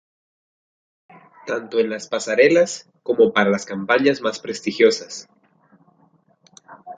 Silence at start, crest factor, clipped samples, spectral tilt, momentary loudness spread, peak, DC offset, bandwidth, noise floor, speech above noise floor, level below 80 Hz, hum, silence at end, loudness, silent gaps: 1.45 s; 20 dB; under 0.1%; -4 dB/octave; 13 LU; -2 dBFS; under 0.1%; 9.4 kHz; -59 dBFS; 40 dB; -68 dBFS; none; 0 s; -19 LUFS; none